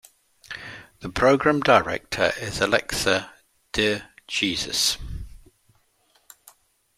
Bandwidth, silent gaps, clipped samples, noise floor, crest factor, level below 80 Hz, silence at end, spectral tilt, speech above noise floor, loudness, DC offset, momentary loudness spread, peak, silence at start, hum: 16 kHz; none; under 0.1%; -64 dBFS; 24 dB; -46 dBFS; 1.6 s; -3 dB/octave; 42 dB; -22 LUFS; under 0.1%; 19 LU; -2 dBFS; 0.5 s; none